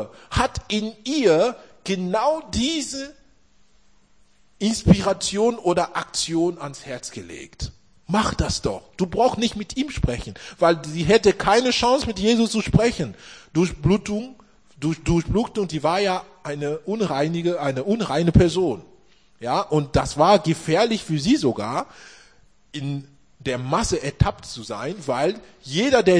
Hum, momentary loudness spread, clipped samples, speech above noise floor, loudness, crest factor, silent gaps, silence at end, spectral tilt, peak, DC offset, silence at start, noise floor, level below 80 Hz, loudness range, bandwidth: none; 15 LU; under 0.1%; 39 dB; -22 LUFS; 20 dB; none; 0 s; -5 dB/octave; -2 dBFS; 0.2%; 0 s; -60 dBFS; -40 dBFS; 6 LU; 10.5 kHz